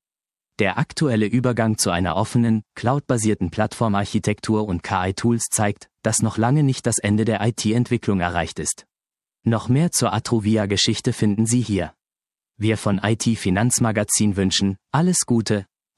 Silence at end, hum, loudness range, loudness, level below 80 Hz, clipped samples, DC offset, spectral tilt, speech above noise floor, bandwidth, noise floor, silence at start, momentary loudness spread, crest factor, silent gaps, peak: 0.35 s; none; 2 LU; -21 LUFS; -44 dBFS; under 0.1%; under 0.1%; -5 dB/octave; over 70 dB; 14.5 kHz; under -90 dBFS; 0.6 s; 5 LU; 18 dB; none; -2 dBFS